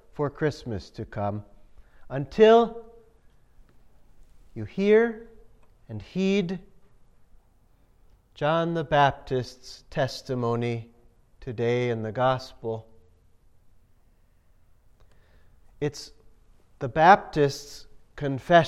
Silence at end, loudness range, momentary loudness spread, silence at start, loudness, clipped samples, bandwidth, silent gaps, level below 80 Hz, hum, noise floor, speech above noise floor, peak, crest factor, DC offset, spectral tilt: 0 s; 13 LU; 21 LU; 0.15 s; -25 LUFS; under 0.1%; 12.5 kHz; none; -54 dBFS; none; -60 dBFS; 35 dB; -2 dBFS; 24 dB; under 0.1%; -6.5 dB/octave